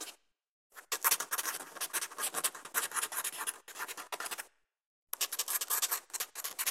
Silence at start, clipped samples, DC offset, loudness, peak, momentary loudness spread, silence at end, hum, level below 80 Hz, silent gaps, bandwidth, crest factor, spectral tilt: 0 s; under 0.1%; under 0.1%; -35 LUFS; -12 dBFS; 11 LU; 0 s; none; -88 dBFS; 0.49-0.70 s, 4.86-5.07 s; 16.5 kHz; 26 dB; 2.5 dB/octave